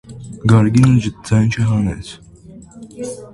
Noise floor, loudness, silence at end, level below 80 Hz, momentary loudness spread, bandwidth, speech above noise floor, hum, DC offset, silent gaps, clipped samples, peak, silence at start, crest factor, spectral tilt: -39 dBFS; -15 LUFS; 0.1 s; -38 dBFS; 18 LU; 11.5 kHz; 25 dB; none; under 0.1%; none; under 0.1%; 0 dBFS; 0.1 s; 16 dB; -7 dB/octave